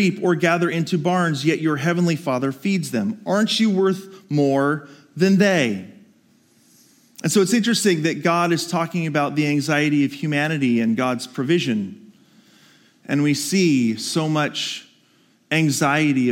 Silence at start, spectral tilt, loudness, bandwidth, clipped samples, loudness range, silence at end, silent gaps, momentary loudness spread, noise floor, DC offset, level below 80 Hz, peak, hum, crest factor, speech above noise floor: 0 s; -5 dB/octave; -20 LUFS; 17 kHz; under 0.1%; 3 LU; 0 s; none; 7 LU; -58 dBFS; under 0.1%; -74 dBFS; -4 dBFS; none; 16 dB; 39 dB